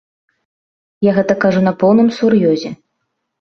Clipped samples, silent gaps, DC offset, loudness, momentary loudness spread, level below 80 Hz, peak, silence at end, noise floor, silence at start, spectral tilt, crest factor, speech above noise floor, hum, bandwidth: under 0.1%; none; under 0.1%; -13 LUFS; 6 LU; -56 dBFS; -2 dBFS; 0.65 s; -72 dBFS; 1 s; -7.5 dB/octave; 14 dB; 60 dB; none; 6.6 kHz